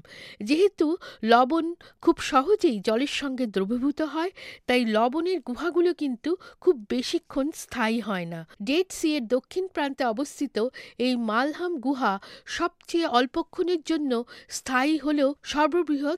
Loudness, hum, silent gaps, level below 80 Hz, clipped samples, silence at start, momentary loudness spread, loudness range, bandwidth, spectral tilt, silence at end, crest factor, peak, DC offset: -26 LUFS; none; none; -60 dBFS; under 0.1%; 0.1 s; 8 LU; 4 LU; 14.5 kHz; -4 dB/octave; 0 s; 20 dB; -6 dBFS; under 0.1%